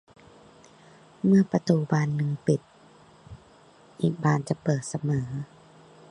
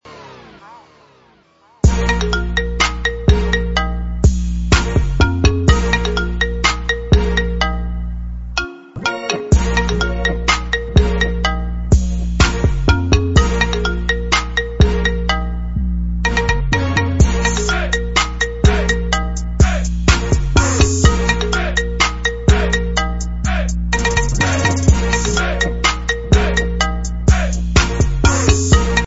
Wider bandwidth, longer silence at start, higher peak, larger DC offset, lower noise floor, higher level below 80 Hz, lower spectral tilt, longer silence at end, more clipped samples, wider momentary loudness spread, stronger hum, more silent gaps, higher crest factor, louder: first, 10.5 kHz vs 8 kHz; first, 1.25 s vs 0 s; second, -6 dBFS vs 0 dBFS; second, under 0.1% vs 1%; first, -55 dBFS vs -51 dBFS; second, -62 dBFS vs -18 dBFS; first, -7.5 dB/octave vs -4.5 dB/octave; first, 0.65 s vs 0 s; neither; about the same, 8 LU vs 6 LU; neither; neither; first, 22 dB vs 16 dB; second, -26 LUFS vs -16 LUFS